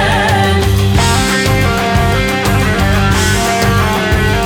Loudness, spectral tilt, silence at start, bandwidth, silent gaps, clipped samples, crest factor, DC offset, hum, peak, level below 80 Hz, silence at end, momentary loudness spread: -12 LUFS; -4.5 dB/octave; 0 s; 19 kHz; none; under 0.1%; 10 dB; under 0.1%; none; 0 dBFS; -20 dBFS; 0 s; 2 LU